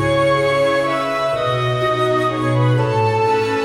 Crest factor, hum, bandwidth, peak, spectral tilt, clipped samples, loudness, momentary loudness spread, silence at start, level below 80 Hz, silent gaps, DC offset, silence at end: 12 dB; none; 14.5 kHz; -4 dBFS; -6.5 dB/octave; under 0.1%; -17 LUFS; 3 LU; 0 s; -46 dBFS; none; under 0.1%; 0 s